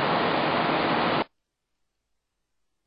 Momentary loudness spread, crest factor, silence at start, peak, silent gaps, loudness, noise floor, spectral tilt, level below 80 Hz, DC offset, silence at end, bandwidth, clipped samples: 5 LU; 16 dB; 0 s; -12 dBFS; none; -24 LUFS; -78 dBFS; -8.5 dB/octave; -60 dBFS; under 0.1%; 1.6 s; 5.4 kHz; under 0.1%